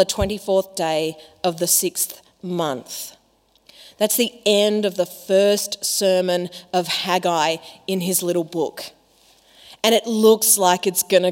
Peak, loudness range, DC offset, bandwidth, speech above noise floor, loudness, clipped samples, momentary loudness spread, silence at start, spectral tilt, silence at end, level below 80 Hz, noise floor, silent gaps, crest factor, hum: 0 dBFS; 4 LU; under 0.1%; 16.5 kHz; 40 dB; -19 LUFS; under 0.1%; 12 LU; 0 s; -3 dB/octave; 0 s; -48 dBFS; -60 dBFS; none; 20 dB; none